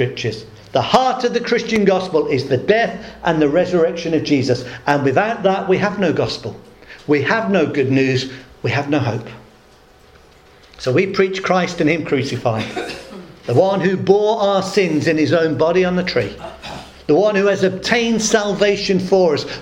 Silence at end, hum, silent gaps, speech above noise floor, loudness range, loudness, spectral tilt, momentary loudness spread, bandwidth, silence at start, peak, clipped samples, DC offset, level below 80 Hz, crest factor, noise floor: 0 s; none; none; 31 dB; 4 LU; -17 LUFS; -5.5 dB/octave; 11 LU; 15.5 kHz; 0 s; 0 dBFS; under 0.1%; under 0.1%; -48 dBFS; 18 dB; -47 dBFS